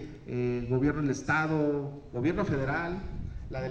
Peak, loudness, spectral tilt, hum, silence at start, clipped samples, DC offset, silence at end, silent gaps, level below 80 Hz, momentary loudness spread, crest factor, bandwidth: -14 dBFS; -31 LUFS; -7 dB/octave; none; 0 s; under 0.1%; under 0.1%; 0 s; none; -46 dBFS; 10 LU; 16 dB; 8.6 kHz